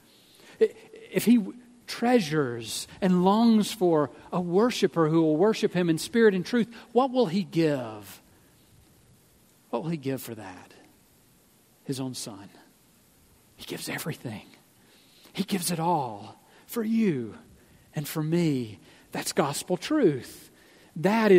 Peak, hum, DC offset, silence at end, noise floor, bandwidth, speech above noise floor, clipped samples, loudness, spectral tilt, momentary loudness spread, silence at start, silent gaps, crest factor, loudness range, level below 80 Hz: -6 dBFS; none; under 0.1%; 0 s; -61 dBFS; 16 kHz; 35 dB; under 0.1%; -26 LUFS; -5.5 dB/octave; 18 LU; 0.6 s; none; 20 dB; 14 LU; -68 dBFS